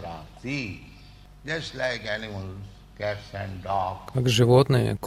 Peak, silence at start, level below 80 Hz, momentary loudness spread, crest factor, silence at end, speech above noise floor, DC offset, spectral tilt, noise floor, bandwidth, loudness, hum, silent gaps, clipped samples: -6 dBFS; 0 s; -50 dBFS; 21 LU; 20 dB; 0 s; 23 dB; under 0.1%; -6 dB/octave; -48 dBFS; 14.5 kHz; -26 LUFS; none; none; under 0.1%